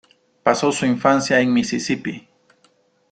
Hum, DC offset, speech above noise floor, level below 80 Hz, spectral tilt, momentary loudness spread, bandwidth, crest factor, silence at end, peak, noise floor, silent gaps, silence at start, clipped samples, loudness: none; under 0.1%; 42 dB; -60 dBFS; -4.5 dB/octave; 9 LU; 9.4 kHz; 20 dB; 0.95 s; -2 dBFS; -60 dBFS; none; 0.45 s; under 0.1%; -19 LUFS